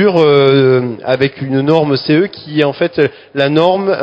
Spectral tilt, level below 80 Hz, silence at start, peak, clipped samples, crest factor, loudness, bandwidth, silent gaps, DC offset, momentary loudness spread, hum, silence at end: -8 dB/octave; -54 dBFS; 0 s; 0 dBFS; 0.2%; 12 dB; -12 LUFS; 7.6 kHz; none; under 0.1%; 7 LU; none; 0 s